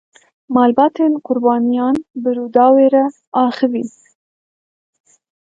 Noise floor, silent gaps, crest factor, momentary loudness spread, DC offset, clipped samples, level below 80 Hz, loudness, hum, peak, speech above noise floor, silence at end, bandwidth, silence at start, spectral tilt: under -90 dBFS; 3.27-3.32 s; 16 dB; 9 LU; under 0.1%; under 0.1%; -62 dBFS; -15 LUFS; none; 0 dBFS; over 76 dB; 1.55 s; 7.8 kHz; 0.5 s; -7 dB/octave